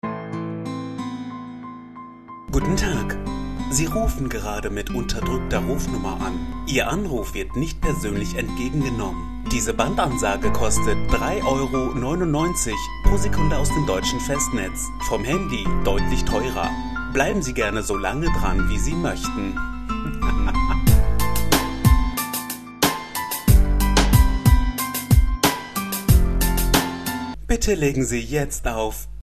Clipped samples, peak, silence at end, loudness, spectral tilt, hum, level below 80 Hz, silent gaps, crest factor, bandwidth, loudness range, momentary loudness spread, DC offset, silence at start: under 0.1%; -2 dBFS; 0 s; -23 LUFS; -5 dB/octave; none; -26 dBFS; none; 20 dB; 14 kHz; 5 LU; 10 LU; 2%; 0 s